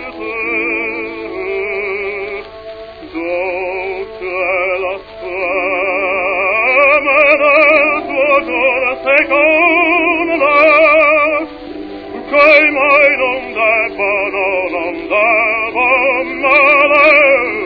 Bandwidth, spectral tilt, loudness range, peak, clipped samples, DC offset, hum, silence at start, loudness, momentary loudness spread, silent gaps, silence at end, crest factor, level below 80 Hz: 5.4 kHz; -5.5 dB/octave; 10 LU; 0 dBFS; 0.2%; under 0.1%; none; 0 s; -11 LUFS; 15 LU; none; 0 s; 12 dB; -46 dBFS